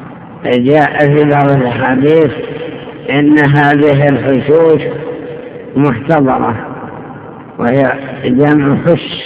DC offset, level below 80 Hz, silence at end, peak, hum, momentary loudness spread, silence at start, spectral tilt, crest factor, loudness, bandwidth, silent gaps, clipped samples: under 0.1%; -44 dBFS; 0 s; 0 dBFS; none; 17 LU; 0 s; -11 dB/octave; 10 dB; -10 LUFS; 4 kHz; none; 0.7%